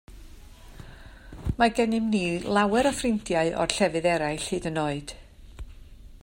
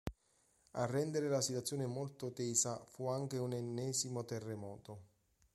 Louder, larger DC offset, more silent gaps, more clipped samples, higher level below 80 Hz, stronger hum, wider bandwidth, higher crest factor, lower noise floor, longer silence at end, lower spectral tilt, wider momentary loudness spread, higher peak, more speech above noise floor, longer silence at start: first, -25 LUFS vs -39 LUFS; neither; neither; neither; first, -44 dBFS vs -66 dBFS; neither; first, 16 kHz vs 13.5 kHz; about the same, 24 dB vs 22 dB; second, -46 dBFS vs -75 dBFS; second, 0.05 s vs 0.5 s; about the same, -4.5 dB/octave vs -4.5 dB/octave; first, 24 LU vs 14 LU; first, -2 dBFS vs -20 dBFS; second, 21 dB vs 36 dB; about the same, 0.1 s vs 0.05 s